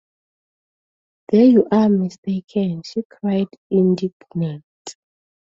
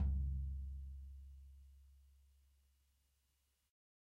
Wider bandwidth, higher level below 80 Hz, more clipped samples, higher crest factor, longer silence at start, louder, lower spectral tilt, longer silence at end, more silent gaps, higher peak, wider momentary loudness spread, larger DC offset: first, 8 kHz vs 1.4 kHz; second, -62 dBFS vs -48 dBFS; neither; about the same, 16 dB vs 16 dB; first, 1.3 s vs 0 s; first, -19 LUFS vs -46 LUFS; second, -8 dB/octave vs -9.5 dB/octave; second, 0.65 s vs 1.95 s; first, 2.18-2.23 s, 3.05-3.10 s, 3.58-3.70 s, 4.13-4.20 s, 4.64-4.85 s vs none; first, -4 dBFS vs -30 dBFS; second, 17 LU vs 23 LU; neither